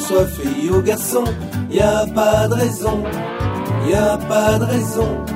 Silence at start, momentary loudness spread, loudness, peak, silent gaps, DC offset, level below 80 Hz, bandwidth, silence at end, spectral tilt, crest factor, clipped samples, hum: 0 s; 7 LU; -17 LUFS; -2 dBFS; none; under 0.1%; -32 dBFS; 16.5 kHz; 0 s; -5.5 dB/octave; 16 dB; under 0.1%; none